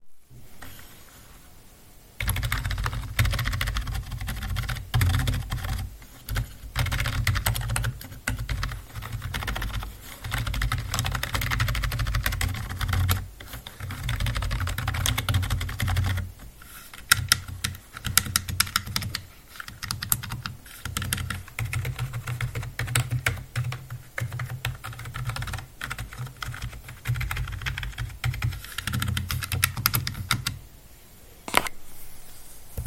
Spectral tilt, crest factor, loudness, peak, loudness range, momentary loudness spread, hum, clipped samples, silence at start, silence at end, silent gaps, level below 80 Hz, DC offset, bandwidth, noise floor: -3 dB/octave; 30 dB; -28 LUFS; 0 dBFS; 6 LU; 15 LU; none; under 0.1%; 0 s; 0 s; none; -36 dBFS; under 0.1%; 17 kHz; -50 dBFS